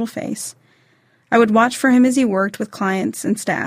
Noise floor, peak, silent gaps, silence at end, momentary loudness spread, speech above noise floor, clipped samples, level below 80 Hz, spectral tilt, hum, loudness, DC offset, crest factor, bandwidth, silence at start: -58 dBFS; -2 dBFS; none; 0 s; 12 LU; 41 dB; under 0.1%; -62 dBFS; -5 dB/octave; none; -17 LUFS; under 0.1%; 16 dB; 16 kHz; 0 s